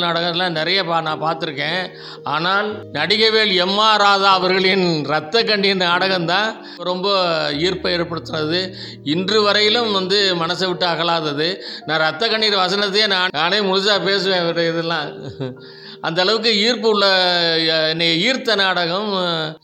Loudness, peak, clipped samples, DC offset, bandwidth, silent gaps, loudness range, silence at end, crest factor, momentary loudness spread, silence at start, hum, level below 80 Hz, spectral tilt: -17 LUFS; -2 dBFS; under 0.1%; under 0.1%; 12 kHz; none; 3 LU; 0.05 s; 16 dB; 10 LU; 0 s; none; -60 dBFS; -4 dB/octave